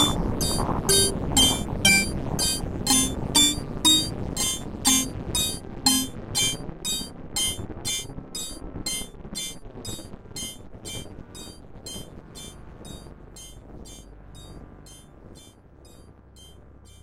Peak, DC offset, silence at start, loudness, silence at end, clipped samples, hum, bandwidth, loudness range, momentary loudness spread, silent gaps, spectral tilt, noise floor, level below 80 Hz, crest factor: -4 dBFS; under 0.1%; 0 s; -23 LUFS; 0.05 s; under 0.1%; none; 16 kHz; 22 LU; 24 LU; none; -2 dB/octave; -50 dBFS; -40 dBFS; 22 dB